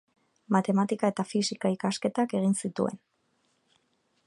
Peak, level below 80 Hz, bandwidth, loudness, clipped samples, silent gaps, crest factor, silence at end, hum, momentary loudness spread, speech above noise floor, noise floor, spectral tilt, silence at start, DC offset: -10 dBFS; -76 dBFS; 11.5 kHz; -28 LUFS; under 0.1%; none; 20 dB; 1.3 s; none; 6 LU; 45 dB; -72 dBFS; -5.5 dB/octave; 0.5 s; under 0.1%